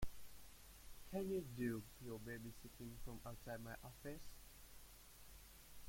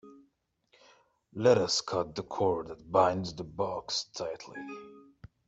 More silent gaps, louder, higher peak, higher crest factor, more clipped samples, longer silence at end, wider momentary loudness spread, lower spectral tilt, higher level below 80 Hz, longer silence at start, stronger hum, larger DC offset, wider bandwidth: neither; second, -52 LUFS vs -30 LUFS; second, -32 dBFS vs -10 dBFS; about the same, 20 dB vs 22 dB; neither; second, 0 s vs 0.2 s; about the same, 16 LU vs 17 LU; first, -5.5 dB/octave vs -4 dB/octave; about the same, -62 dBFS vs -64 dBFS; about the same, 0 s vs 0.05 s; neither; neither; first, 16.5 kHz vs 8.2 kHz